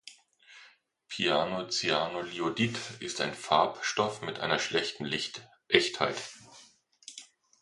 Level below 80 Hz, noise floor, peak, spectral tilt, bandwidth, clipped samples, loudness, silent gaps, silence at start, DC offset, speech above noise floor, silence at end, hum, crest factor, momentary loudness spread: -68 dBFS; -60 dBFS; -4 dBFS; -3 dB/octave; 11.5 kHz; under 0.1%; -30 LUFS; none; 0.05 s; under 0.1%; 30 dB; 0.35 s; none; 28 dB; 20 LU